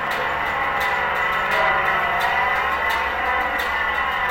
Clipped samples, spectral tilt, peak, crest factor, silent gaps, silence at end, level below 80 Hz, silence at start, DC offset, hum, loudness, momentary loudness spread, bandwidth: under 0.1%; -3 dB/octave; -6 dBFS; 14 dB; none; 0 s; -42 dBFS; 0 s; under 0.1%; none; -20 LUFS; 3 LU; 16.5 kHz